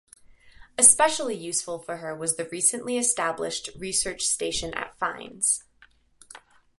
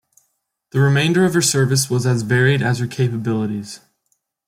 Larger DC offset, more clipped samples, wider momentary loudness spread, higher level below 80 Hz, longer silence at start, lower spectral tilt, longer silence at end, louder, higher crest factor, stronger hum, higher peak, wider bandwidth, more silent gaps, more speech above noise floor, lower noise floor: neither; neither; first, 16 LU vs 10 LU; about the same, -56 dBFS vs -56 dBFS; about the same, 0.8 s vs 0.75 s; second, -1 dB/octave vs -5 dB/octave; second, 0.4 s vs 0.7 s; second, -23 LUFS vs -17 LUFS; first, 26 dB vs 14 dB; neither; about the same, -2 dBFS vs -4 dBFS; second, 12 kHz vs 16 kHz; neither; second, 33 dB vs 53 dB; second, -59 dBFS vs -70 dBFS